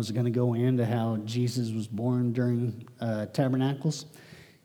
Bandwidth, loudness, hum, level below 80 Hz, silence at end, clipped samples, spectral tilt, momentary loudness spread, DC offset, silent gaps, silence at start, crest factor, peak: 14 kHz; -29 LUFS; none; -76 dBFS; 0.2 s; under 0.1%; -7 dB/octave; 7 LU; under 0.1%; none; 0 s; 14 dB; -14 dBFS